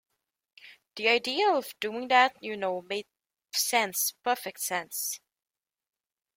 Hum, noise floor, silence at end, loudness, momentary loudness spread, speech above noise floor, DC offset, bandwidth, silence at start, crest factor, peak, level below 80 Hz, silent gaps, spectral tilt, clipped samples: none; under -90 dBFS; 1.2 s; -28 LUFS; 11 LU; over 62 dB; under 0.1%; 16.5 kHz; 0.65 s; 22 dB; -8 dBFS; -80 dBFS; none; -1 dB/octave; under 0.1%